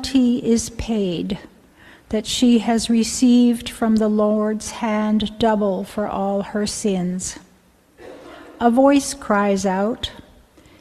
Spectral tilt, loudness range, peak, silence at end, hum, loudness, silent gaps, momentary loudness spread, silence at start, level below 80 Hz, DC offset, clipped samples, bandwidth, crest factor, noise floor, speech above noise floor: -5 dB/octave; 4 LU; -2 dBFS; 0.65 s; none; -19 LUFS; none; 11 LU; 0 s; -46 dBFS; under 0.1%; under 0.1%; 13 kHz; 16 dB; -54 dBFS; 36 dB